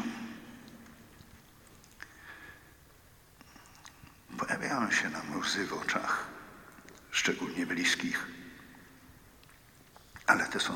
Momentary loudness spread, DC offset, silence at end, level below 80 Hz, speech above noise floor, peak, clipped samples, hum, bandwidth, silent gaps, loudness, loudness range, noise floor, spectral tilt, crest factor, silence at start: 25 LU; under 0.1%; 0 s; -66 dBFS; 27 dB; -10 dBFS; under 0.1%; none; 19 kHz; none; -32 LUFS; 20 LU; -59 dBFS; -2.5 dB/octave; 28 dB; 0 s